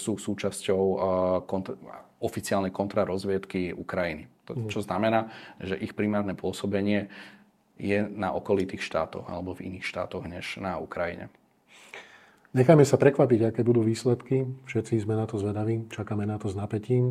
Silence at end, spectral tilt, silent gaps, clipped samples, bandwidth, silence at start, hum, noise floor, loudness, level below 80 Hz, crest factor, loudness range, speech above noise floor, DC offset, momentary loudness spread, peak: 0 s; -6.5 dB/octave; none; under 0.1%; 15 kHz; 0 s; none; -56 dBFS; -28 LUFS; -64 dBFS; 24 dB; 8 LU; 29 dB; under 0.1%; 14 LU; -4 dBFS